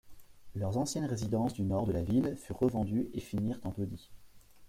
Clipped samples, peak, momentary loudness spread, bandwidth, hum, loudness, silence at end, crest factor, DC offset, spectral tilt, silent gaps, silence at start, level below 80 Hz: under 0.1%; -18 dBFS; 8 LU; 16 kHz; none; -34 LUFS; 0 s; 16 dB; under 0.1%; -7 dB/octave; none; 0.05 s; -56 dBFS